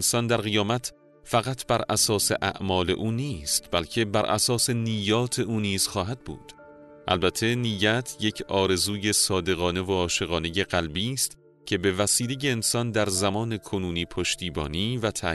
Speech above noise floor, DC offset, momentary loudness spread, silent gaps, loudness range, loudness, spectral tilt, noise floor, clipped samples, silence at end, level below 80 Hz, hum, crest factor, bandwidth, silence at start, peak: 22 dB; under 0.1%; 7 LU; none; 2 LU; -25 LUFS; -3.5 dB/octave; -48 dBFS; under 0.1%; 0 s; -50 dBFS; none; 16 dB; 12.5 kHz; 0 s; -8 dBFS